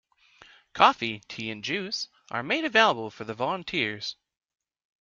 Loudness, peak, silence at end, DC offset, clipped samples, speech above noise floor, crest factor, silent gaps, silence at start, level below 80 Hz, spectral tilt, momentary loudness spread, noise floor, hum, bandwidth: -26 LUFS; -4 dBFS; 0.9 s; under 0.1%; under 0.1%; 30 dB; 24 dB; none; 0.75 s; -68 dBFS; -3.5 dB/octave; 14 LU; -56 dBFS; none; 7.6 kHz